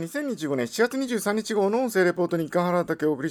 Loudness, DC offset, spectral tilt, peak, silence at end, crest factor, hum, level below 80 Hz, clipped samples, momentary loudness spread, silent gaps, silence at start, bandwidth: -25 LUFS; under 0.1%; -5.5 dB/octave; -10 dBFS; 0 s; 16 dB; none; -68 dBFS; under 0.1%; 5 LU; none; 0 s; 19.5 kHz